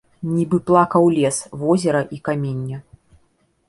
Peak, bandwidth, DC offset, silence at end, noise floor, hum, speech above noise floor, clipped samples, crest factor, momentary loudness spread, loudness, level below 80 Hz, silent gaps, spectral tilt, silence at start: -2 dBFS; 11.5 kHz; under 0.1%; 0.9 s; -62 dBFS; none; 44 dB; under 0.1%; 18 dB; 11 LU; -19 LUFS; -56 dBFS; none; -6.5 dB/octave; 0.2 s